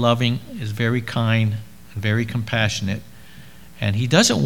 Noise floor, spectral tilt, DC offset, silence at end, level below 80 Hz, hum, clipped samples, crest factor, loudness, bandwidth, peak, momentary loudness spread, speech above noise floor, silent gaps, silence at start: -44 dBFS; -4.5 dB/octave; 0.8%; 0 s; -50 dBFS; none; under 0.1%; 20 dB; -21 LUFS; 18 kHz; 0 dBFS; 12 LU; 24 dB; none; 0 s